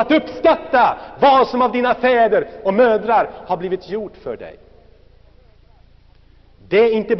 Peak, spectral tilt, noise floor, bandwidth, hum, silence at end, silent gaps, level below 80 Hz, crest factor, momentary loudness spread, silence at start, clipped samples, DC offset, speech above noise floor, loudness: -4 dBFS; -3 dB/octave; -48 dBFS; 6.2 kHz; none; 0 s; none; -50 dBFS; 14 dB; 14 LU; 0 s; under 0.1%; under 0.1%; 32 dB; -16 LUFS